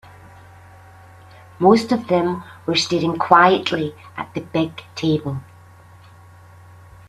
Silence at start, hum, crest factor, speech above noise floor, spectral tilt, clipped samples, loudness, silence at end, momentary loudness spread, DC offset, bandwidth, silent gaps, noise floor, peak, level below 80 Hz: 1.6 s; none; 20 dB; 27 dB; -5.5 dB/octave; under 0.1%; -19 LUFS; 1.65 s; 16 LU; under 0.1%; 13.5 kHz; none; -45 dBFS; 0 dBFS; -58 dBFS